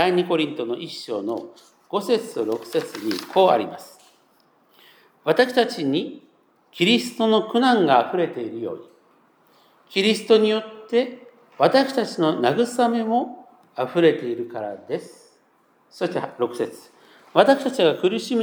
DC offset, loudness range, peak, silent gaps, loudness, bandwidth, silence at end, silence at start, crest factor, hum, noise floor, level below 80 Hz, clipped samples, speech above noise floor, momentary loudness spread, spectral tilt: under 0.1%; 5 LU; 0 dBFS; none; -22 LUFS; over 20 kHz; 0 s; 0 s; 22 dB; none; -61 dBFS; -82 dBFS; under 0.1%; 40 dB; 13 LU; -5 dB/octave